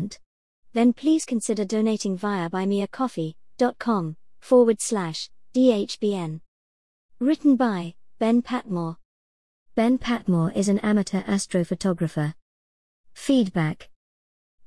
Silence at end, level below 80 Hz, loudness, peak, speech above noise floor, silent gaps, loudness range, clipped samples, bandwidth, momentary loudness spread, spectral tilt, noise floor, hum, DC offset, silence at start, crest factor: 0.8 s; -58 dBFS; -24 LUFS; -6 dBFS; over 67 dB; 0.26-0.63 s, 6.48-7.09 s, 9.05-9.66 s, 12.42-13.04 s; 2 LU; under 0.1%; 12 kHz; 11 LU; -6 dB/octave; under -90 dBFS; none; 0.3%; 0 s; 18 dB